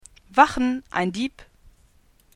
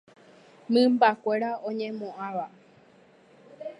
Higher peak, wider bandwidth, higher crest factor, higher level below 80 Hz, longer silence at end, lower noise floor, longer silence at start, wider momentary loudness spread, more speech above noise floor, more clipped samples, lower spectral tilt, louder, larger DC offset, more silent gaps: first, -2 dBFS vs -6 dBFS; about the same, 12 kHz vs 11 kHz; about the same, 24 dB vs 22 dB; first, -48 dBFS vs -84 dBFS; first, 0.95 s vs 0.05 s; about the same, -58 dBFS vs -57 dBFS; second, 0.35 s vs 0.7 s; second, 11 LU vs 14 LU; first, 36 dB vs 32 dB; neither; about the same, -5 dB/octave vs -6 dB/octave; first, -22 LUFS vs -26 LUFS; neither; neither